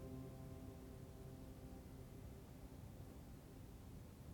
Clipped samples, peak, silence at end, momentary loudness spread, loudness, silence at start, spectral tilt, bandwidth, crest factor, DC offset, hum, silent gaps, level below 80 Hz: under 0.1%; -42 dBFS; 0 s; 4 LU; -57 LUFS; 0 s; -7 dB/octave; 19 kHz; 14 dB; under 0.1%; none; none; -62 dBFS